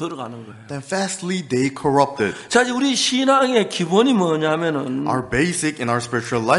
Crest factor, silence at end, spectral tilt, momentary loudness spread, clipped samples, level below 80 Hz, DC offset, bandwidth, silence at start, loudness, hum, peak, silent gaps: 18 dB; 0 s; -4 dB/octave; 10 LU; under 0.1%; -52 dBFS; under 0.1%; 11.5 kHz; 0 s; -19 LUFS; none; -2 dBFS; none